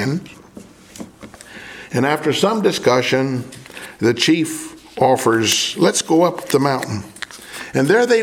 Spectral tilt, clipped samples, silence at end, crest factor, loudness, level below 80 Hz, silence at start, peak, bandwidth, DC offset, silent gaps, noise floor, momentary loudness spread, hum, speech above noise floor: -4 dB/octave; under 0.1%; 0 s; 18 dB; -17 LUFS; -58 dBFS; 0 s; 0 dBFS; 17.5 kHz; under 0.1%; none; -41 dBFS; 20 LU; none; 24 dB